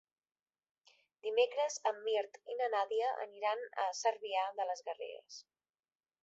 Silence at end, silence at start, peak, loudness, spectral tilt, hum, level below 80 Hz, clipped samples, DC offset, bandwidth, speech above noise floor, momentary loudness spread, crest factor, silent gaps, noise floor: 0.8 s; 1.25 s; -18 dBFS; -37 LUFS; 3 dB/octave; none; under -90 dBFS; under 0.1%; under 0.1%; 8 kHz; over 53 dB; 12 LU; 20 dB; none; under -90 dBFS